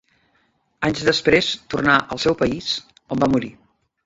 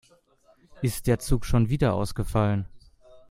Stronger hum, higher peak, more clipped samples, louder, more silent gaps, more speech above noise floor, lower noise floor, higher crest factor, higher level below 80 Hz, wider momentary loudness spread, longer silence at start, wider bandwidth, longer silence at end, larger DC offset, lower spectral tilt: neither; first, -2 dBFS vs -8 dBFS; neither; first, -20 LUFS vs -26 LUFS; neither; first, 45 dB vs 37 dB; first, -65 dBFS vs -61 dBFS; about the same, 20 dB vs 20 dB; second, -48 dBFS vs -36 dBFS; about the same, 9 LU vs 7 LU; about the same, 0.8 s vs 0.75 s; second, 8 kHz vs 16 kHz; first, 0.55 s vs 0.1 s; neither; second, -4.5 dB/octave vs -6.5 dB/octave